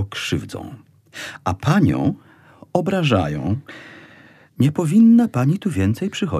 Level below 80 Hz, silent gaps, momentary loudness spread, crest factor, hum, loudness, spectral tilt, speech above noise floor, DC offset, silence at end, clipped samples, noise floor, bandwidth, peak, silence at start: -48 dBFS; none; 20 LU; 18 dB; none; -19 LUFS; -7 dB/octave; 30 dB; under 0.1%; 0 s; under 0.1%; -48 dBFS; 13.5 kHz; -2 dBFS; 0 s